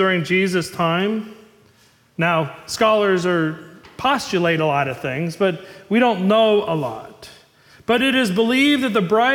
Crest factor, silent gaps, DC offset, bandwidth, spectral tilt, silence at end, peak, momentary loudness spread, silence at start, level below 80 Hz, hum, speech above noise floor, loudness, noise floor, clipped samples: 14 dB; none; under 0.1%; 18 kHz; -5 dB/octave; 0 s; -6 dBFS; 12 LU; 0 s; -58 dBFS; none; 36 dB; -19 LUFS; -55 dBFS; under 0.1%